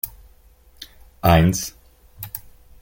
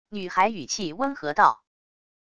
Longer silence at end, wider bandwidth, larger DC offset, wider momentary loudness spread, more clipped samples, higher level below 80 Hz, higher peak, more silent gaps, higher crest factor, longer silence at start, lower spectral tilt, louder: second, 0.4 s vs 0.75 s; first, 17 kHz vs 10 kHz; second, under 0.1% vs 0.4%; first, 26 LU vs 9 LU; neither; first, -38 dBFS vs -62 dBFS; about the same, -2 dBFS vs -4 dBFS; neither; about the same, 22 dB vs 22 dB; about the same, 0.05 s vs 0.1 s; first, -5.5 dB/octave vs -3 dB/octave; first, -19 LUFS vs -24 LUFS